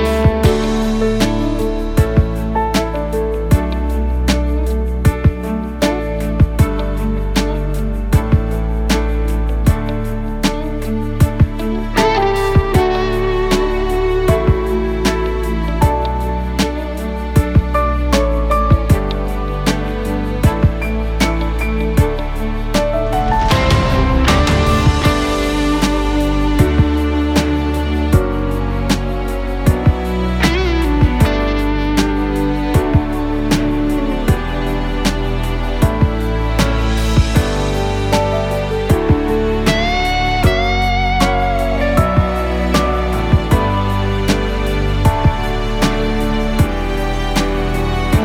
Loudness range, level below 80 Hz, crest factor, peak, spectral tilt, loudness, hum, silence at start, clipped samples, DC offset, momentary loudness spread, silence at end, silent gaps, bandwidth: 3 LU; -20 dBFS; 14 dB; 0 dBFS; -6 dB/octave; -16 LUFS; none; 0 s; under 0.1%; under 0.1%; 6 LU; 0 s; none; 17 kHz